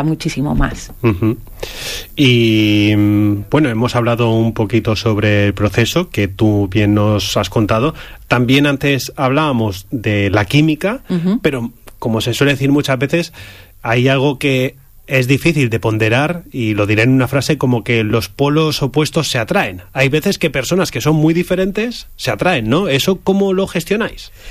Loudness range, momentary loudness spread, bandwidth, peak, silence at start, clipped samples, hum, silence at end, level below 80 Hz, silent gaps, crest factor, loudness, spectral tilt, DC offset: 2 LU; 8 LU; 15.5 kHz; -2 dBFS; 0 s; under 0.1%; none; 0 s; -34 dBFS; none; 14 dB; -15 LUFS; -6 dB/octave; under 0.1%